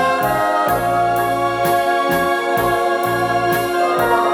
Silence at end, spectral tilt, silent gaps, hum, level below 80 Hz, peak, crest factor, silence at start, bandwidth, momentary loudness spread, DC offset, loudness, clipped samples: 0 s; -4.5 dB/octave; none; none; -44 dBFS; -4 dBFS; 12 dB; 0 s; 18 kHz; 1 LU; under 0.1%; -17 LUFS; under 0.1%